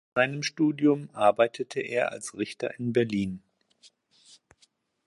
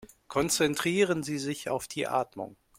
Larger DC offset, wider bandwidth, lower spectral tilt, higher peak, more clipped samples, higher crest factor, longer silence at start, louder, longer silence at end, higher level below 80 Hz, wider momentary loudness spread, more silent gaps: neither; second, 11.5 kHz vs 16.5 kHz; first, -5.5 dB/octave vs -3.5 dB/octave; first, -8 dBFS vs -12 dBFS; neither; about the same, 22 dB vs 18 dB; first, 0.15 s vs 0 s; about the same, -27 LUFS vs -29 LUFS; first, 1.7 s vs 0.25 s; about the same, -66 dBFS vs -62 dBFS; first, 11 LU vs 8 LU; neither